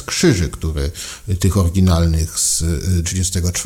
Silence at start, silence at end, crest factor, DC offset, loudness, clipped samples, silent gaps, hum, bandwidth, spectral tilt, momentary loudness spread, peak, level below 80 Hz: 0 s; 0 s; 16 dB; under 0.1%; -17 LUFS; under 0.1%; none; none; 16.5 kHz; -4.5 dB/octave; 8 LU; -2 dBFS; -28 dBFS